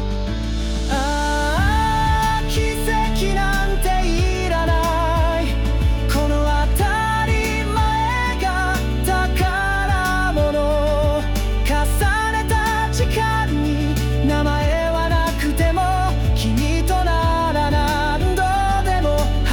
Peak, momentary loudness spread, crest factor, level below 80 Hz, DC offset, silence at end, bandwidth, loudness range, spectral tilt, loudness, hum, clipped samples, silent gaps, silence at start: -8 dBFS; 2 LU; 10 dB; -22 dBFS; under 0.1%; 0 s; over 20 kHz; 1 LU; -5.5 dB/octave; -19 LUFS; none; under 0.1%; none; 0 s